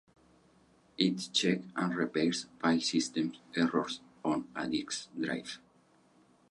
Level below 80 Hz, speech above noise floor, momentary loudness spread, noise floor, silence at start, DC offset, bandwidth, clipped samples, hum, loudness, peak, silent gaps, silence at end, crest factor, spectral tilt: -72 dBFS; 33 dB; 9 LU; -66 dBFS; 1 s; under 0.1%; 11.5 kHz; under 0.1%; none; -33 LUFS; -14 dBFS; none; 0.95 s; 20 dB; -4 dB/octave